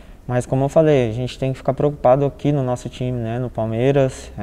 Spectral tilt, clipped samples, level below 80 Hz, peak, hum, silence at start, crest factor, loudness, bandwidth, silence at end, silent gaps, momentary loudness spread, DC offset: -7.5 dB/octave; under 0.1%; -40 dBFS; -4 dBFS; none; 0.1 s; 16 dB; -19 LUFS; 11 kHz; 0 s; none; 9 LU; under 0.1%